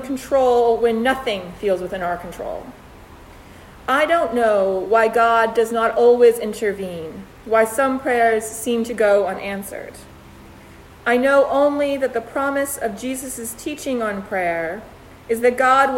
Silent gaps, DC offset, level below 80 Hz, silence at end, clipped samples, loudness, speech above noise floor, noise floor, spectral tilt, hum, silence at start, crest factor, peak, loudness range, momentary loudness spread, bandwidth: none; under 0.1%; -50 dBFS; 0 s; under 0.1%; -19 LUFS; 24 dB; -43 dBFS; -4 dB/octave; none; 0 s; 16 dB; -2 dBFS; 7 LU; 14 LU; 16.5 kHz